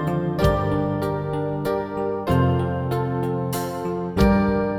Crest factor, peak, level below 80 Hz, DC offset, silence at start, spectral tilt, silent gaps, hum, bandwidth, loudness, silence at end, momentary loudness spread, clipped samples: 16 dB; -6 dBFS; -34 dBFS; under 0.1%; 0 s; -7.5 dB/octave; none; none; 19 kHz; -23 LUFS; 0 s; 7 LU; under 0.1%